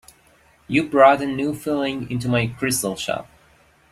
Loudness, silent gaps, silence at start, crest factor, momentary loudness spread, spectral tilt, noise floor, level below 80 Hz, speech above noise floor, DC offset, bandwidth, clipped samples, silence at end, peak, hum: -20 LUFS; none; 0.7 s; 20 dB; 12 LU; -5 dB/octave; -56 dBFS; -54 dBFS; 36 dB; under 0.1%; 16 kHz; under 0.1%; 0.7 s; -2 dBFS; none